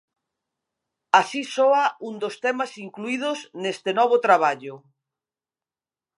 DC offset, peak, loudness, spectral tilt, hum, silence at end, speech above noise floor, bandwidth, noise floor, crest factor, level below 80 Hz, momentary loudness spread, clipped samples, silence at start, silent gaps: under 0.1%; -2 dBFS; -22 LUFS; -3.5 dB/octave; none; 1.4 s; over 68 dB; 11.5 kHz; under -90 dBFS; 24 dB; -84 dBFS; 12 LU; under 0.1%; 1.15 s; none